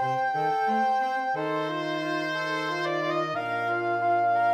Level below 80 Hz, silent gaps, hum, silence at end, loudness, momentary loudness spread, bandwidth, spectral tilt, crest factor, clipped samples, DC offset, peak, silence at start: -82 dBFS; none; none; 0 s; -27 LUFS; 4 LU; 14.5 kHz; -5.5 dB/octave; 10 dB; under 0.1%; under 0.1%; -16 dBFS; 0 s